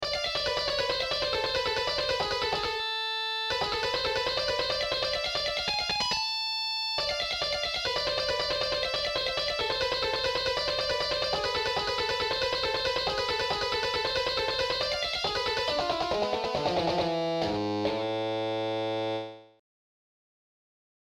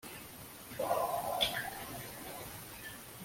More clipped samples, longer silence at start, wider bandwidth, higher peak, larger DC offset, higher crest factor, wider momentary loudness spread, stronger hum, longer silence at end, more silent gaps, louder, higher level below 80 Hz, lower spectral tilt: neither; about the same, 0 s vs 0.05 s; about the same, 16.5 kHz vs 16.5 kHz; about the same, -16 dBFS vs -16 dBFS; neither; second, 14 dB vs 22 dB; second, 2 LU vs 14 LU; neither; first, 1.7 s vs 0 s; neither; first, -28 LUFS vs -38 LUFS; first, -52 dBFS vs -64 dBFS; about the same, -3 dB/octave vs -2.5 dB/octave